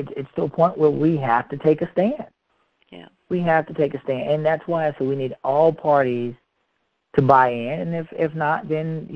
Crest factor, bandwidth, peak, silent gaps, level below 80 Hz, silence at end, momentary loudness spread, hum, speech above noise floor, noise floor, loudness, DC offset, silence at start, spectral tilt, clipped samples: 22 dB; 6.2 kHz; 0 dBFS; none; -58 dBFS; 0 s; 10 LU; none; 51 dB; -72 dBFS; -21 LUFS; under 0.1%; 0 s; -9.5 dB/octave; under 0.1%